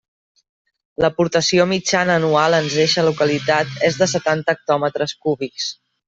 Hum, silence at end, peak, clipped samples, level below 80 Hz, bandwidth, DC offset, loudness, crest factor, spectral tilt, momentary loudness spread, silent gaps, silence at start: none; 0.35 s; -2 dBFS; under 0.1%; -54 dBFS; 8.2 kHz; under 0.1%; -18 LUFS; 16 dB; -4 dB/octave; 7 LU; none; 1 s